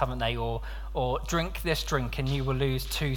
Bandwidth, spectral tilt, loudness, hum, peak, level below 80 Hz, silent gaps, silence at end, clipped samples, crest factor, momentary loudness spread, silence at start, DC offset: 19 kHz; -5 dB/octave; -30 LUFS; none; -12 dBFS; -36 dBFS; none; 0 s; under 0.1%; 18 dB; 4 LU; 0 s; under 0.1%